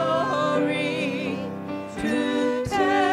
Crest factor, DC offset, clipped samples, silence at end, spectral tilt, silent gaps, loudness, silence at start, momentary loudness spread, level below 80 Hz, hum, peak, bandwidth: 16 dB; under 0.1%; under 0.1%; 0 s; -5.5 dB/octave; none; -25 LUFS; 0 s; 9 LU; -54 dBFS; none; -8 dBFS; 14 kHz